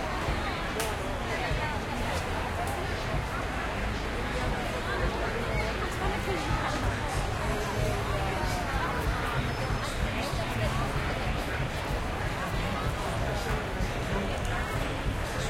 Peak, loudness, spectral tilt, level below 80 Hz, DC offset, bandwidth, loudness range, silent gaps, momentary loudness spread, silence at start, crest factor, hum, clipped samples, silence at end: -12 dBFS; -31 LUFS; -5 dB/octave; -36 dBFS; under 0.1%; 16.5 kHz; 1 LU; none; 2 LU; 0 s; 18 dB; none; under 0.1%; 0 s